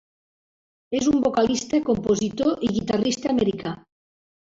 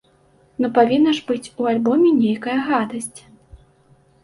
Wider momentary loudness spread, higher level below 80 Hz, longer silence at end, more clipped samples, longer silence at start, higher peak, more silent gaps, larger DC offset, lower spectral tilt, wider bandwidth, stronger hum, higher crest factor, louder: second, 8 LU vs 12 LU; first, -52 dBFS vs -58 dBFS; about the same, 0.75 s vs 0.65 s; neither; first, 0.9 s vs 0.6 s; second, -8 dBFS vs -2 dBFS; neither; neither; about the same, -5 dB/octave vs -5 dB/octave; second, 8 kHz vs 11.5 kHz; neither; about the same, 16 dB vs 18 dB; second, -23 LUFS vs -18 LUFS